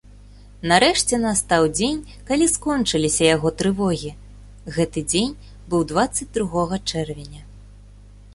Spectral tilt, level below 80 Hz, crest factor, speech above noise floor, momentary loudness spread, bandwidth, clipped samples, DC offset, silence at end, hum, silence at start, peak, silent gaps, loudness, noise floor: -3.5 dB/octave; -42 dBFS; 20 dB; 24 dB; 14 LU; 12 kHz; under 0.1%; under 0.1%; 0 s; 50 Hz at -40 dBFS; 0.6 s; -2 dBFS; none; -20 LUFS; -44 dBFS